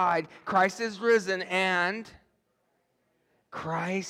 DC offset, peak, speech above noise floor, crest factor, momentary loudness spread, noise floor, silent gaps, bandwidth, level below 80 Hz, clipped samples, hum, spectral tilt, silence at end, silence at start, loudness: under 0.1%; -12 dBFS; 46 dB; 18 dB; 12 LU; -74 dBFS; none; 14 kHz; -72 dBFS; under 0.1%; none; -4.5 dB/octave; 0 s; 0 s; -27 LUFS